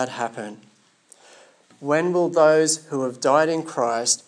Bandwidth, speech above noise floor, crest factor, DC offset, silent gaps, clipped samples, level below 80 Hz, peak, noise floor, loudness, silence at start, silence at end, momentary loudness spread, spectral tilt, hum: 10.5 kHz; 34 dB; 18 dB; under 0.1%; none; under 0.1%; -84 dBFS; -4 dBFS; -55 dBFS; -21 LUFS; 0 s; 0.1 s; 14 LU; -3.5 dB/octave; none